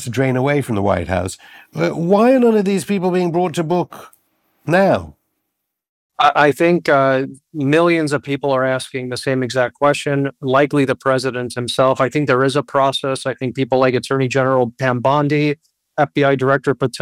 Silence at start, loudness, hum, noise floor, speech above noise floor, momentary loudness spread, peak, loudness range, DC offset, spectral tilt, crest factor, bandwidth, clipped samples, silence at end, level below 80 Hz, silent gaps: 0 s; -17 LUFS; none; -76 dBFS; 60 dB; 8 LU; -2 dBFS; 2 LU; under 0.1%; -6 dB/octave; 14 dB; 16 kHz; under 0.1%; 0 s; -56 dBFS; 5.89-6.10 s